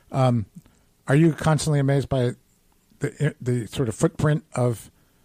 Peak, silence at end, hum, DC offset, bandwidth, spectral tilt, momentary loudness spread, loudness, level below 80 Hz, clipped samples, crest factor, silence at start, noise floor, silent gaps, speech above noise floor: -8 dBFS; 0.4 s; none; under 0.1%; 15.5 kHz; -6.5 dB/octave; 12 LU; -23 LUFS; -50 dBFS; under 0.1%; 16 dB; 0.1 s; -61 dBFS; none; 39 dB